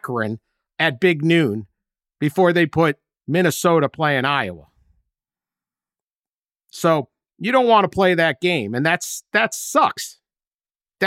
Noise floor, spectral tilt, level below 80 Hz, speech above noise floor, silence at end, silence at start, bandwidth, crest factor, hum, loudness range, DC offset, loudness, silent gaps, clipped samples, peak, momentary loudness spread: under -90 dBFS; -5 dB/octave; -60 dBFS; over 72 dB; 0 s; 0.05 s; 16.5 kHz; 16 dB; none; 6 LU; under 0.1%; -19 LUFS; 6.03-6.24 s, 6.32-6.42 s, 10.47-10.59 s; under 0.1%; -4 dBFS; 13 LU